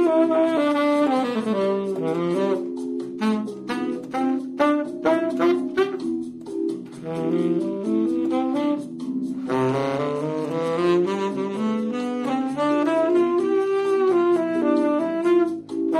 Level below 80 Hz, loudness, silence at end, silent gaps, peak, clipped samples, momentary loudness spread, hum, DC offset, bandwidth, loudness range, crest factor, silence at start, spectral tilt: -68 dBFS; -23 LUFS; 0 s; none; -6 dBFS; under 0.1%; 8 LU; none; under 0.1%; 11 kHz; 4 LU; 16 dB; 0 s; -7 dB/octave